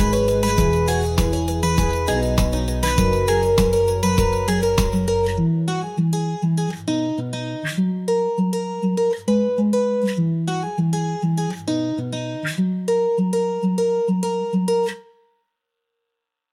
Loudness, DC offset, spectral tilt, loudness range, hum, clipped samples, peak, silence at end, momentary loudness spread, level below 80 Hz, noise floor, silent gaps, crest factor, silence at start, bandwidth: -21 LUFS; under 0.1%; -6 dB/octave; 4 LU; none; under 0.1%; -6 dBFS; 1.5 s; 5 LU; -30 dBFS; -80 dBFS; none; 14 dB; 0 s; 16.5 kHz